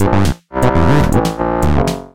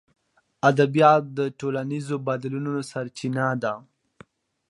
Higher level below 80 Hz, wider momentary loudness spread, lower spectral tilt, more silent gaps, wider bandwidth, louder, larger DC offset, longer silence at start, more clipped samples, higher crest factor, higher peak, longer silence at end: first, -22 dBFS vs -70 dBFS; second, 5 LU vs 12 LU; about the same, -7 dB/octave vs -6.5 dB/octave; neither; first, 17 kHz vs 11.5 kHz; first, -14 LUFS vs -24 LUFS; neither; second, 0 s vs 0.65 s; neither; second, 12 dB vs 22 dB; about the same, 0 dBFS vs -2 dBFS; second, 0 s vs 0.9 s